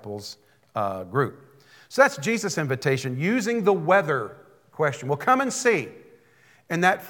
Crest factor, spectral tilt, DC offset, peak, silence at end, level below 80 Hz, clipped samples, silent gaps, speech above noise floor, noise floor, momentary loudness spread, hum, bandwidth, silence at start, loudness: 22 dB; -5 dB/octave; under 0.1%; -4 dBFS; 0 s; -76 dBFS; under 0.1%; none; 34 dB; -58 dBFS; 13 LU; none; 18 kHz; 0.05 s; -24 LUFS